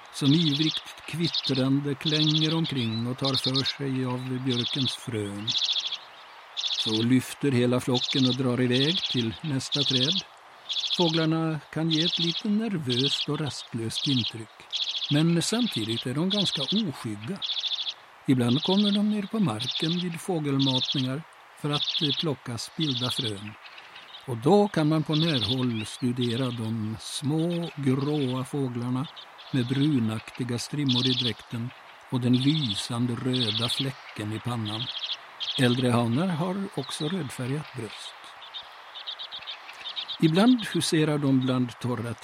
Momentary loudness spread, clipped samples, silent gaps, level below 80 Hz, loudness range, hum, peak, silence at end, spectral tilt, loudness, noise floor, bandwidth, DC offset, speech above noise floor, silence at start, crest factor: 13 LU; under 0.1%; none; -66 dBFS; 3 LU; none; -6 dBFS; 0 s; -5 dB/octave; -26 LUFS; -47 dBFS; 15.5 kHz; under 0.1%; 21 dB; 0 s; 20 dB